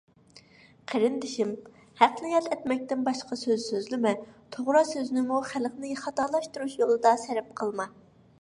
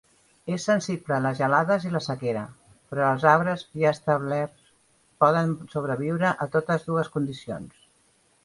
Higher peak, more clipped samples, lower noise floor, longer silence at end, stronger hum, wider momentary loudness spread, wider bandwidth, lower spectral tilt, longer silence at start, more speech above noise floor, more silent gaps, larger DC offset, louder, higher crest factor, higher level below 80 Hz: about the same, -4 dBFS vs -4 dBFS; neither; second, -56 dBFS vs -64 dBFS; second, 0.5 s vs 0.75 s; neither; about the same, 11 LU vs 12 LU; about the same, 11.5 kHz vs 11.5 kHz; second, -4 dB/octave vs -6.5 dB/octave; about the same, 0.35 s vs 0.45 s; second, 29 dB vs 39 dB; neither; neither; second, -28 LUFS vs -25 LUFS; about the same, 24 dB vs 22 dB; second, -72 dBFS vs -64 dBFS